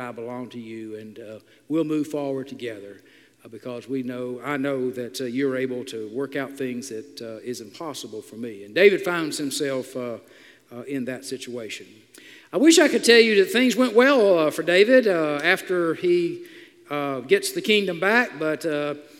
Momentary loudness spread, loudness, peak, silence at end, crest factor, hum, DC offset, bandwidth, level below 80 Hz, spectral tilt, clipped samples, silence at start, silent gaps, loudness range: 19 LU; -22 LUFS; -2 dBFS; 0.15 s; 20 dB; none; under 0.1%; 16 kHz; -78 dBFS; -3.5 dB/octave; under 0.1%; 0 s; none; 13 LU